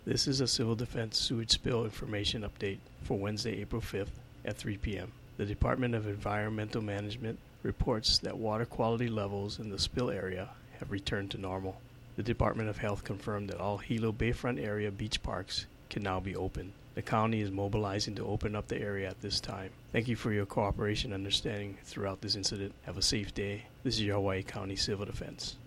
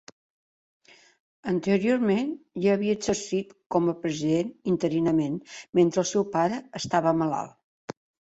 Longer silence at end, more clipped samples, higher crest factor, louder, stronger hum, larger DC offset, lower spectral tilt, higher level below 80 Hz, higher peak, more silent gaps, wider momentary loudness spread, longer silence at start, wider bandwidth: second, 0 s vs 0.4 s; neither; about the same, 22 dB vs 18 dB; second, -35 LUFS vs -26 LUFS; neither; neither; second, -4.5 dB/octave vs -6 dB/octave; first, -48 dBFS vs -64 dBFS; second, -14 dBFS vs -10 dBFS; second, none vs 3.66-3.70 s, 5.69-5.73 s, 7.64-7.88 s; second, 10 LU vs 13 LU; second, 0 s vs 1.45 s; first, 16 kHz vs 8.2 kHz